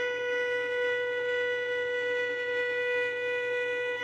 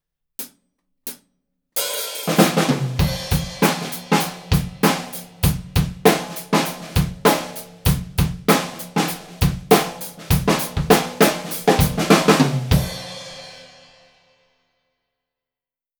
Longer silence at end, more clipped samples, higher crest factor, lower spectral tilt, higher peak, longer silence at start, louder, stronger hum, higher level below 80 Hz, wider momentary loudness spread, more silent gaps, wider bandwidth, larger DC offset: second, 0 s vs 2.35 s; neither; second, 10 dB vs 20 dB; second, -2.5 dB/octave vs -5 dB/octave; second, -20 dBFS vs 0 dBFS; second, 0 s vs 0.4 s; second, -29 LUFS vs -19 LUFS; neither; second, -72 dBFS vs -34 dBFS; second, 1 LU vs 17 LU; neither; second, 8.8 kHz vs over 20 kHz; neither